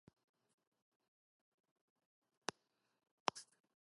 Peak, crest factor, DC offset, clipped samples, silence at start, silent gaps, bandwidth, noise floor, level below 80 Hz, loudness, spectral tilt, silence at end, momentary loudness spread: -16 dBFS; 38 dB; under 0.1%; under 0.1%; 3.25 s; none; 11 kHz; -82 dBFS; under -90 dBFS; -47 LUFS; -1.5 dB/octave; 0.4 s; 14 LU